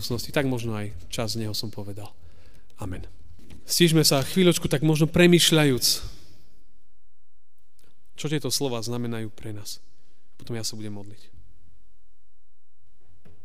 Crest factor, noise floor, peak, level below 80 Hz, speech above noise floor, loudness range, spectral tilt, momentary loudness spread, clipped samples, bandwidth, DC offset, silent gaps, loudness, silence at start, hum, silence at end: 22 dB; -68 dBFS; -6 dBFS; -50 dBFS; 44 dB; 18 LU; -4.5 dB/octave; 21 LU; under 0.1%; 16 kHz; 2%; none; -23 LUFS; 0 s; none; 2.3 s